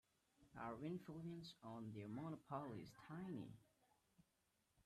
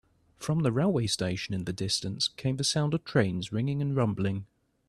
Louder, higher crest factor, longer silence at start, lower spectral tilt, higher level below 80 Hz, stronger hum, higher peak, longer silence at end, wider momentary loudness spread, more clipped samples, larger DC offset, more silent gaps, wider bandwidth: second, -54 LUFS vs -29 LUFS; about the same, 18 dB vs 20 dB; about the same, 0.4 s vs 0.4 s; first, -7.5 dB/octave vs -5 dB/octave; second, -82 dBFS vs -58 dBFS; neither; second, -36 dBFS vs -10 dBFS; second, 0.05 s vs 0.45 s; about the same, 6 LU vs 6 LU; neither; neither; neither; about the same, 13.5 kHz vs 13 kHz